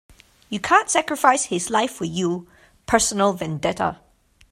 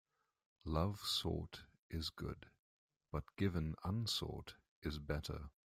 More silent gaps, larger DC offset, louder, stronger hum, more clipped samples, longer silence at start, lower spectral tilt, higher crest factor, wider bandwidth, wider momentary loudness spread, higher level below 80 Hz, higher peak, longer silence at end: second, none vs 1.79-1.90 s, 2.59-2.89 s, 4.69-4.82 s; neither; first, -21 LUFS vs -43 LUFS; neither; neither; second, 0.5 s vs 0.65 s; second, -3 dB/octave vs -5 dB/octave; about the same, 22 dB vs 20 dB; about the same, 16 kHz vs 16 kHz; second, 9 LU vs 14 LU; about the same, -52 dBFS vs -56 dBFS; first, 0 dBFS vs -24 dBFS; first, 0.55 s vs 0.15 s